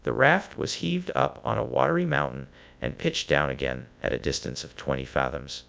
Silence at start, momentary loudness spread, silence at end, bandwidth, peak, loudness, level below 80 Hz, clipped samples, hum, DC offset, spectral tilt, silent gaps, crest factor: 0.05 s; 11 LU; 0.05 s; 8 kHz; -4 dBFS; -27 LUFS; -46 dBFS; under 0.1%; none; under 0.1%; -5 dB/octave; none; 22 dB